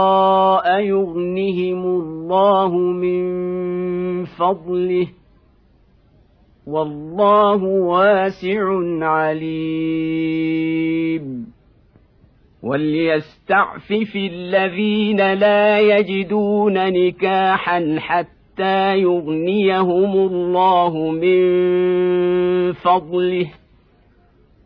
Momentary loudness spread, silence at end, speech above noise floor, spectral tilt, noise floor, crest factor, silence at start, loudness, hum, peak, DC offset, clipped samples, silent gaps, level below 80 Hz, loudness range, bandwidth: 9 LU; 1.15 s; 36 dB; -9 dB/octave; -53 dBFS; 14 dB; 0 s; -17 LUFS; none; -4 dBFS; under 0.1%; under 0.1%; none; -56 dBFS; 6 LU; 5.4 kHz